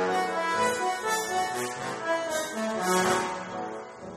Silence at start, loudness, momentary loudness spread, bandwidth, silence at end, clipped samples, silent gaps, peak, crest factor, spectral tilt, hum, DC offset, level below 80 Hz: 0 s; -28 LUFS; 10 LU; 15.5 kHz; 0 s; under 0.1%; none; -12 dBFS; 18 dB; -3 dB/octave; none; under 0.1%; -66 dBFS